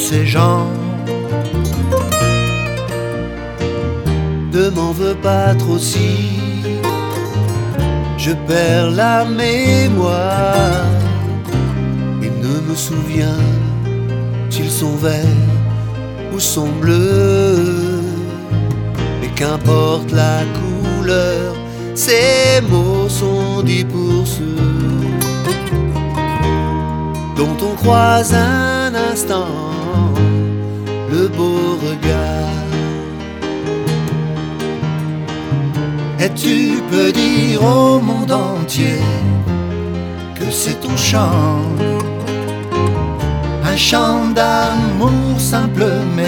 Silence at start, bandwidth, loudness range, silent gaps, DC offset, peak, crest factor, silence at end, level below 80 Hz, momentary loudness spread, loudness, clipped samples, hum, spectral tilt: 0 s; 19.5 kHz; 4 LU; none; under 0.1%; 0 dBFS; 14 dB; 0 s; -30 dBFS; 8 LU; -15 LUFS; under 0.1%; none; -5.5 dB/octave